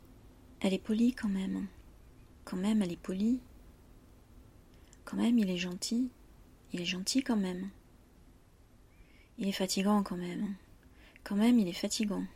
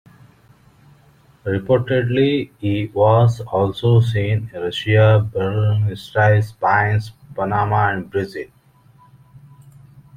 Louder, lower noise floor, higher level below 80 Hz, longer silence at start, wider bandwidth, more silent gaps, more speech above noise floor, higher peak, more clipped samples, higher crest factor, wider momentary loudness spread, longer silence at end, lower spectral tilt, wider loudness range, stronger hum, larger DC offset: second, -33 LUFS vs -18 LUFS; first, -60 dBFS vs -52 dBFS; second, -60 dBFS vs -50 dBFS; second, 0.25 s vs 1.45 s; first, 15.5 kHz vs 8.6 kHz; neither; second, 29 dB vs 35 dB; second, -18 dBFS vs -2 dBFS; neither; about the same, 16 dB vs 16 dB; first, 13 LU vs 10 LU; second, 0 s vs 0.8 s; second, -5 dB/octave vs -8 dB/octave; about the same, 4 LU vs 5 LU; neither; neither